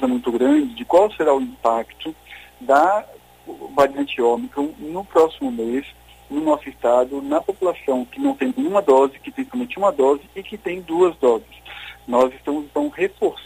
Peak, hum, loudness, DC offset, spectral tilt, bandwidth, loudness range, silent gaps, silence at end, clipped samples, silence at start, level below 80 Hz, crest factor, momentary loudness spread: -2 dBFS; none; -20 LUFS; under 0.1%; -5.5 dB/octave; 15.5 kHz; 2 LU; none; 0 s; under 0.1%; 0 s; -54 dBFS; 16 dB; 16 LU